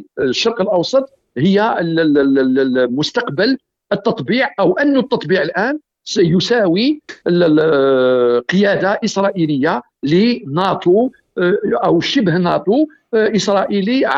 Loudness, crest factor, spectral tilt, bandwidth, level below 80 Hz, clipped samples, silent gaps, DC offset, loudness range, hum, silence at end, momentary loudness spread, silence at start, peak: -15 LUFS; 12 dB; -6 dB/octave; 8 kHz; -56 dBFS; under 0.1%; none; under 0.1%; 2 LU; none; 0 s; 6 LU; 0 s; -4 dBFS